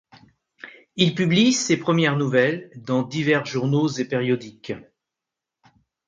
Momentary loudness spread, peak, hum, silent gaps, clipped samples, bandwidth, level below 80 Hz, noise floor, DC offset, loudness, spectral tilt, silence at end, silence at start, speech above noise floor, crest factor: 16 LU; -2 dBFS; none; none; under 0.1%; 9.4 kHz; -64 dBFS; -86 dBFS; under 0.1%; -21 LUFS; -5 dB/octave; 1.25 s; 0.65 s; 65 dB; 20 dB